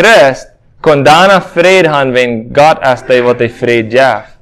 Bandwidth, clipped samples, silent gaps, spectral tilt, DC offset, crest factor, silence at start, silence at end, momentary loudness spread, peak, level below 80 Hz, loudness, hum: 16 kHz; 3%; none; -4.5 dB/octave; under 0.1%; 8 dB; 0 s; 0.2 s; 7 LU; 0 dBFS; -42 dBFS; -8 LUFS; none